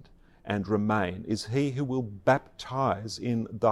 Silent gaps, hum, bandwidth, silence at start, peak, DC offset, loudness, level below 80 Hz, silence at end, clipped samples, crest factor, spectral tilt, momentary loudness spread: none; none; 13 kHz; 0 s; -10 dBFS; under 0.1%; -29 LUFS; -60 dBFS; 0 s; under 0.1%; 18 dB; -6.5 dB/octave; 7 LU